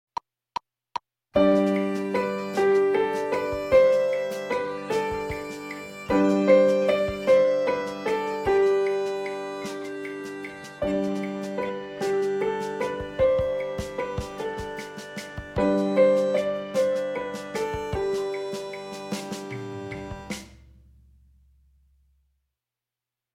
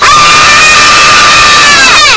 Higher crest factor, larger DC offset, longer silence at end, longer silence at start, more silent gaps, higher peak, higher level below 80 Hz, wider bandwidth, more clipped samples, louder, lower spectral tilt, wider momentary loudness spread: first, 20 dB vs 2 dB; neither; first, 2.85 s vs 0 s; first, 0.95 s vs 0 s; neither; second, -4 dBFS vs 0 dBFS; second, -50 dBFS vs -28 dBFS; first, 15.5 kHz vs 8 kHz; second, under 0.1% vs 30%; second, -25 LUFS vs 0 LUFS; first, -6 dB/octave vs 0 dB/octave; first, 16 LU vs 0 LU